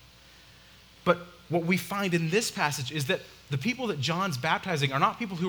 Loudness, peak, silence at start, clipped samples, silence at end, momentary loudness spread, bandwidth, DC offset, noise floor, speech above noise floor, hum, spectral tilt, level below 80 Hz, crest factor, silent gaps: -28 LUFS; -6 dBFS; 1.05 s; under 0.1%; 0 s; 5 LU; over 20 kHz; under 0.1%; -54 dBFS; 26 dB; none; -4.5 dB/octave; -64 dBFS; 22 dB; none